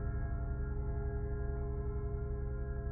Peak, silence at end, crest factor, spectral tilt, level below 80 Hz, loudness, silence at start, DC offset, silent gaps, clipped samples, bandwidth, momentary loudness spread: -26 dBFS; 0 s; 10 dB; -8 dB/octave; -38 dBFS; -40 LUFS; 0 s; under 0.1%; none; under 0.1%; 2.3 kHz; 1 LU